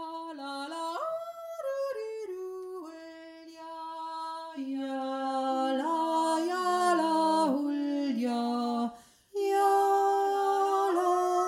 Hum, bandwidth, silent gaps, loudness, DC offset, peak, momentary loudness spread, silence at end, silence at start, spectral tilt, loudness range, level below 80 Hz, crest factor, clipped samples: none; 16 kHz; none; -30 LUFS; under 0.1%; -16 dBFS; 15 LU; 0 s; 0 s; -3.5 dB/octave; 10 LU; -82 dBFS; 14 dB; under 0.1%